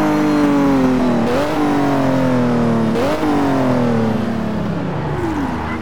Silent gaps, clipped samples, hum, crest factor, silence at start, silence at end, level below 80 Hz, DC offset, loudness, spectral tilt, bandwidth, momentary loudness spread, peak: none; under 0.1%; none; 10 dB; 0 s; 0 s; -38 dBFS; 4%; -16 LUFS; -7 dB/octave; 18.5 kHz; 7 LU; -6 dBFS